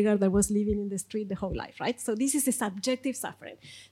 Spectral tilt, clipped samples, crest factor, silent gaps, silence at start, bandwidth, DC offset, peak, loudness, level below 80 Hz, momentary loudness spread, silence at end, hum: -4.5 dB/octave; under 0.1%; 16 dB; none; 0 s; 16 kHz; under 0.1%; -14 dBFS; -29 LUFS; -50 dBFS; 13 LU; 0.05 s; none